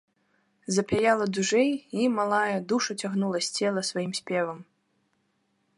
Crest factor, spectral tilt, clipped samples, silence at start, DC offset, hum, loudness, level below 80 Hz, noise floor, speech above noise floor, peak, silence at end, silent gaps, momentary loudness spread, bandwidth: 20 dB; -4 dB/octave; under 0.1%; 0.7 s; under 0.1%; none; -26 LUFS; -62 dBFS; -72 dBFS; 46 dB; -8 dBFS; 1.15 s; none; 6 LU; 11.5 kHz